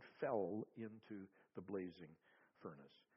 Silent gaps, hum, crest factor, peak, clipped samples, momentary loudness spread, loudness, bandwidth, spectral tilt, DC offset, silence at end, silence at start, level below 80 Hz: none; none; 22 dB; -28 dBFS; under 0.1%; 17 LU; -49 LUFS; 5.6 kHz; -6.5 dB/octave; under 0.1%; 0.2 s; 0 s; -90 dBFS